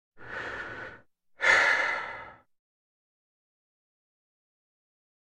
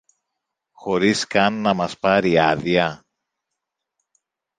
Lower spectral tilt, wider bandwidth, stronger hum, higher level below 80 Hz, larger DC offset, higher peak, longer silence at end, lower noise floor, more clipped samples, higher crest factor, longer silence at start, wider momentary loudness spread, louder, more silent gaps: second, -1.5 dB/octave vs -5 dB/octave; first, 13 kHz vs 9.6 kHz; neither; second, -68 dBFS vs -54 dBFS; neither; second, -8 dBFS vs -2 dBFS; first, 3 s vs 1.6 s; second, -55 dBFS vs -81 dBFS; neither; about the same, 24 dB vs 20 dB; second, 0.15 s vs 0.8 s; first, 21 LU vs 7 LU; second, -25 LUFS vs -19 LUFS; neither